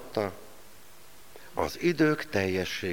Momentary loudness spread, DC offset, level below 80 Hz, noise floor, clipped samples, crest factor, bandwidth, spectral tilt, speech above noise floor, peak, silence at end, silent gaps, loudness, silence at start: 15 LU; 0.5%; -58 dBFS; -54 dBFS; under 0.1%; 18 dB; 19.5 kHz; -5.5 dB/octave; 26 dB; -12 dBFS; 0 s; none; -29 LUFS; 0 s